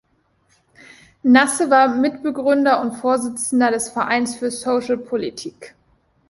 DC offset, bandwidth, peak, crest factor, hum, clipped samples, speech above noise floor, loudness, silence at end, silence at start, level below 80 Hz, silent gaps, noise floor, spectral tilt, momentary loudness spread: under 0.1%; 12 kHz; -2 dBFS; 18 dB; none; under 0.1%; 44 dB; -18 LUFS; 0.6 s; 1.25 s; -60 dBFS; none; -62 dBFS; -3 dB/octave; 10 LU